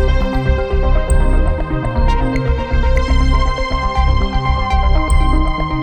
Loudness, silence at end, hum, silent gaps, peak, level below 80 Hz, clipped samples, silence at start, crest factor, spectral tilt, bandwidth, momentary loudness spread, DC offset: -17 LUFS; 0 s; none; none; -2 dBFS; -14 dBFS; under 0.1%; 0 s; 12 dB; -6.5 dB/octave; 9.2 kHz; 3 LU; under 0.1%